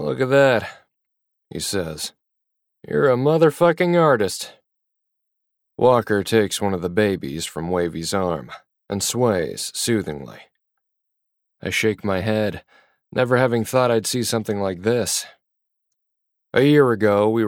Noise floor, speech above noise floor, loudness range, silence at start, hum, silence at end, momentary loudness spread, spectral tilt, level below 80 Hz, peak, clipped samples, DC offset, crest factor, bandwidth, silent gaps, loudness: -77 dBFS; 58 dB; 5 LU; 0 s; none; 0 s; 14 LU; -5 dB/octave; -56 dBFS; -4 dBFS; under 0.1%; under 0.1%; 18 dB; 17.5 kHz; none; -20 LUFS